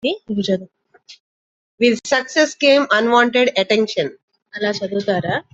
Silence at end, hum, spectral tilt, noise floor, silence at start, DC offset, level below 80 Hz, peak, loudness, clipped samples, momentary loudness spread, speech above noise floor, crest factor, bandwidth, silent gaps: 0.15 s; none; -4 dB/octave; under -90 dBFS; 0.05 s; under 0.1%; -62 dBFS; -2 dBFS; -17 LUFS; under 0.1%; 10 LU; over 73 dB; 16 dB; 8.2 kHz; 1.20-1.78 s, 4.23-4.28 s